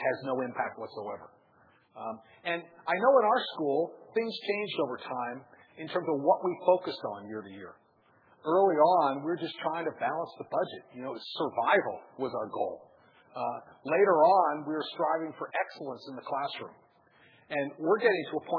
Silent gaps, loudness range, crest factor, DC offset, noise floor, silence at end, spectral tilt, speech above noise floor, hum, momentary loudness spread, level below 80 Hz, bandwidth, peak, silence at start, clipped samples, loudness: none; 4 LU; 20 dB; under 0.1%; -65 dBFS; 0 s; -7.5 dB/octave; 35 dB; none; 17 LU; -86 dBFS; 5.4 kHz; -10 dBFS; 0 s; under 0.1%; -30 LUFS